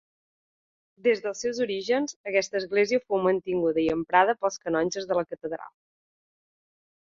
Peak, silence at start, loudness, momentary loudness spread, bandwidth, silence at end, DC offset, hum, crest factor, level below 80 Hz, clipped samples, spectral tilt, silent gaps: -6 dBFS; 1.05 s; -26 LUFS; 7 LU; 7.6 kHz; 1.35 s; under 0.1%; none; 22 dB; -64 dBFS; under 0.1%; -4 dB/octave; 2.16-2.24 s